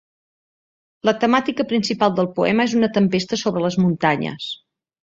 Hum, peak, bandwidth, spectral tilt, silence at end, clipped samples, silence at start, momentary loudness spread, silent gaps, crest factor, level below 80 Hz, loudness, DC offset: none; -2 dBFS; 7.8 kHz; -5.5 dB/octave; 0.5 s; under 0.1%; 1.05 s; 7 LU; none; 18 dB; -60 dBFS; -19 LUFS; under 0.1%